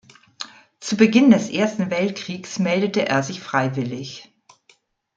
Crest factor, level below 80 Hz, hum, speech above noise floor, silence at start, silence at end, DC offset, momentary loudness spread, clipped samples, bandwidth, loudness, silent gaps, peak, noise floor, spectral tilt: 20 dB; -64 dBFS; none; 40 dB; 0.4 s; 0.95 s; under 0.1%; 21 LU; under 0.1%; 7.8 kHz; -20 LUFS; none; -2 dBFS; -59 dBFS; -5.5 dB/octave